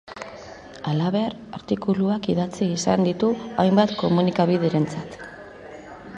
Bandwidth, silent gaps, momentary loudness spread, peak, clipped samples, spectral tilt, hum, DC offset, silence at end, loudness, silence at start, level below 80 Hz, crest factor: 9.6 kHz; none; 20 LU; -6 dBFS; under 0.1%; -6.5 dB/octave; none; under 0.1%; 0 s; -22 LUFS; 0.05 s; -56 dBFS; 18 dB